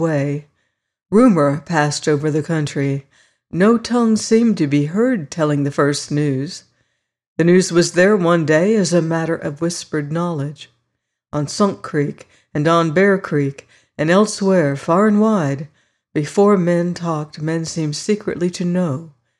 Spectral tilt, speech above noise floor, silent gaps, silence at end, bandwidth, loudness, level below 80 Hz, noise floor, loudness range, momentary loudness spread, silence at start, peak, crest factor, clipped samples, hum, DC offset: -6 dB/octave; 58 dB; 7.27-7.36 s; 0.3 s; 12 kHz; -17 LUFS; -58 dBFS; -74 dBFS; 3 LU; 11 LU; 0 s; -4 dBFS; 14 dB; under 0.1%; none; under 0.1%